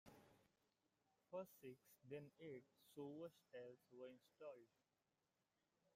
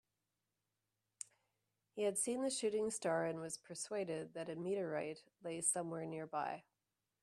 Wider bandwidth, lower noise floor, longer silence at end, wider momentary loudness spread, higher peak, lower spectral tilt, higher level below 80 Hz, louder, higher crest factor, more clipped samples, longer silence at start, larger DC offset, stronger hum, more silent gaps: about the same, 15.5 kHz vs 14.5 kHz; about the same, under -90 dBFS vs -90 dBFS; first, 1.3 s vs 0.6 s; second, 7 LU vs 14 LU; second, -42 dBFS vs -22 dBFS; first, -6.5 dB/octave vs -3.5 dB/octave; about the same, under -90 dBFS vs -86 dBFS; second, -60 LUFS vs -41 LUFS; about the same, 20 dB vs 20 dB; neither; second, 0.05 s vs 1.95 s; neither; neither; neither